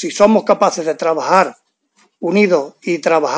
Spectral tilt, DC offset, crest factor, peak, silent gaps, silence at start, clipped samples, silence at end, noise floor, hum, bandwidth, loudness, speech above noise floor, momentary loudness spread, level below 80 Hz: -5 dB/octave; under 0.1%; 14 dB; 0 dBFS; none; 0 s; under 0.1%; 0 s; -58 dBFS; none; 8 kHz; -15 LUFS; 44 dB; 8 LU; -62 dBFS